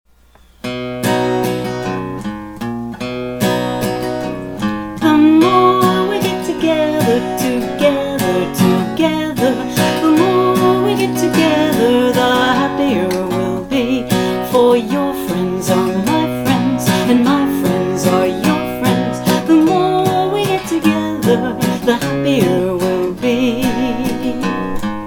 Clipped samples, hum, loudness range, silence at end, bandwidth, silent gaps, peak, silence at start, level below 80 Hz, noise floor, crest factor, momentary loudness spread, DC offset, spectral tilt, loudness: under 0.1%; none; 5 LU; 0 s; 19.5 kHz; none; 0 dBFS; 0.65 s; -42 dBFS; -47 dBFS; 14 dB; 9 LU; under 0.1%; -5.5 dB/octave; -15 LUFS